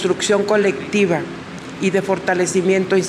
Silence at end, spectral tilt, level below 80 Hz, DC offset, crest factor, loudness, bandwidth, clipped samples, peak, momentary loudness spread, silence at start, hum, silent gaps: 0 s; -4.5 dB/octave; -56 dBFS; under 0.1%; 12 dB; -18 LUFS; 12.5 kHz; under 0.1%; -4 dBFS; 9 LU; 0 s; none; none